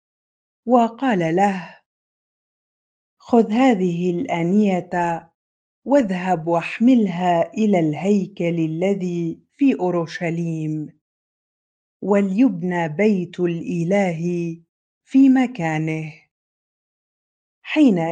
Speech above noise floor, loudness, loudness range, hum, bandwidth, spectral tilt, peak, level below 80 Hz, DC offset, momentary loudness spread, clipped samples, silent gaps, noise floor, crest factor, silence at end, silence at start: over 71 dB; -20 LUFS; 3 LU; none; 9 kHz; -7.5 dB/octave; -2 dBFS; -66 dBFS; under 0.1%; 11 LU; under 0.1%; 1.86-3.17 s, 5.35-5.82 s, 11.01-12.00 s, 14.69-15.01 s, 16.31-17.62 s; under -90 dBFS; 18 dB; 0 s; 0.65 s